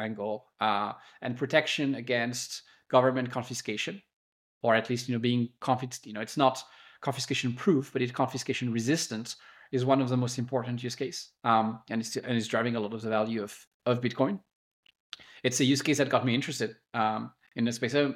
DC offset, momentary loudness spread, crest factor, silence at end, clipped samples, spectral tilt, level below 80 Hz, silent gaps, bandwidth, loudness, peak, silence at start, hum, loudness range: under 0.1%; 12 LU; 22 dB; 0 s; under 0.1%; -4.5 dB/octave; -78 dBFS; 4.13-4.61 s, 13.67-13.80 s, 14.53-14.83 s, 15.00-15.12 s; 16 kHz; -30 LUFS; -8 dBFS; 0 s; none; 2 LU